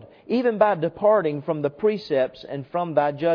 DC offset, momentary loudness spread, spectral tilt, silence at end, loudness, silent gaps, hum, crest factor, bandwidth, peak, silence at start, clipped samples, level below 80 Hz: under 0.1%; 8 LU; -8.5 dB/octave; 0 s; -23 LUFS; none; none; 18 dB; 5.4 kHz; -4 dBFS; 0 s; under 0.1%; -64 dBFS